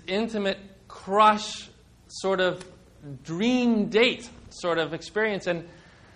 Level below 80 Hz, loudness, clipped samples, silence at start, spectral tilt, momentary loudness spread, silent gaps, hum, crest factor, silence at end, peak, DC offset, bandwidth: -58 dBFS; -25 LUFS; under 0.1%; 0.1 s; -4.5 dB/octave; 19 LU; none; 60 Hz at -55 dBFS; 18 dB; 0.45 s; -8 dBFS; under 0.1%; 11 kHz